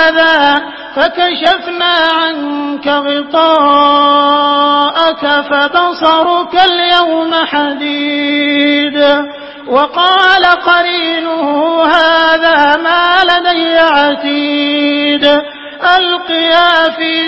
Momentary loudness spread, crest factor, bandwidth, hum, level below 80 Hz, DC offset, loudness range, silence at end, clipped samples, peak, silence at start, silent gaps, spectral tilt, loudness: 6 LU; 10 dB; 8 kHz; none; -50 dBFS; under 0.1%; 2 LU; 0 s; 0.3%; 0 dBFS; 0 s; none; -4 dB/octave; -9 LUFS